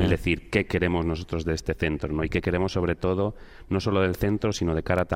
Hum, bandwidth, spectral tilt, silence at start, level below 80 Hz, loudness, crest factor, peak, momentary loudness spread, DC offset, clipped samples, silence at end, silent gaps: none; 16 kHz; -6.5 dB/octave; 0 s; -40 dBFS; -26 LUFS; 18 dB; -8 dBFS; 5 LU; under 0.1%; under 0.1%; 0 s; none